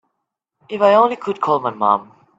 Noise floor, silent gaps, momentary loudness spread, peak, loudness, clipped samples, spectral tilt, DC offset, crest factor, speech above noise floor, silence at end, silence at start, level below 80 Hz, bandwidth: -77 dBFS; none; 8 LU; 0 dBFS; -17 LUFS; under 0.1%; -6.5 dB/octave; under 0.1%; 18 dB; 61 dB; 0.35 s; 0.7 s; -68 dBFS; 7.8 kHz